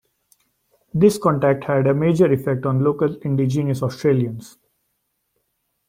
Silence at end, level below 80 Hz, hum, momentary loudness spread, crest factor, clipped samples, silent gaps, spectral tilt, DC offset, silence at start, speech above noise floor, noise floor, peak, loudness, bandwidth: 1.4 s; -56 dBFS; none; 6 LU; 18 dB; under 0.1%; none; -8 dB/octave; under 0.1%; 0.95 s; 54 dB; -72 dBFS; -2 dBFS; -19 LUFS; 16 kHz